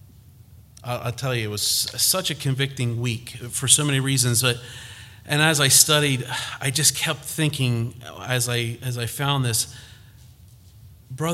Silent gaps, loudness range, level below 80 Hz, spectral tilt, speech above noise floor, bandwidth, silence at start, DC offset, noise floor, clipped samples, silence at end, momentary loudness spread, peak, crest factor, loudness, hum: none; 7 LU; -54 dBFS; -3 dB/octave; 26 dB; 16.5 kHz; 0.5 s; under 0.1%; -48 dBFS; under 0.1%; 0 s; 15 LU; 0 dBFS; 24 dB; -21 LUFS; none